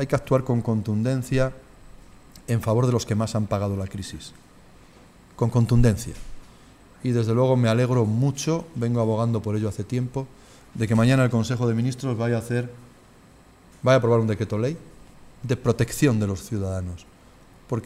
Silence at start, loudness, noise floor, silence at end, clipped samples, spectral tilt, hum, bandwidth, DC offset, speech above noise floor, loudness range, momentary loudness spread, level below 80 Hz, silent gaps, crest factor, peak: 0 s; -23 LUFS; -51 dBFS; 0 s; under 0.1%; -7 dB/octave; none; 14.5 kHz; under 0.1%; 29 dB; 4 LU; 14 LU; -42 dBFS; none; 18 dB; -6 dBFS